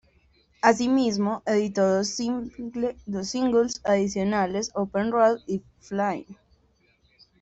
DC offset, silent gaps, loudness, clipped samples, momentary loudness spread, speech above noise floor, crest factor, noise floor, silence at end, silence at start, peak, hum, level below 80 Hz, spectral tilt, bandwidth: under 0.1%; none; -25 LUFS; under 0.1%; 10 LU; 40 dB; 20 dB; -64 dBFS; 1.05 s; 0.65 s; -4 dBFS; none; -58 dBFS; -5 dB/octave; 8.2 kHz